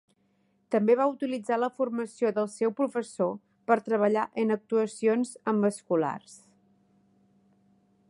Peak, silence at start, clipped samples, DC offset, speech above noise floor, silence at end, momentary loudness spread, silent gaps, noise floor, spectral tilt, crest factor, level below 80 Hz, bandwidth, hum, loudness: -8 dBFS; 0.7 s; under 0.1%; under 0.1%; 43 dB; 1.75 s; 7 LU; none; -70 dBFS; -6.5 dB/octave; 20 dB; -80 dBFS; 11.5 kHz; none; -28 LUFS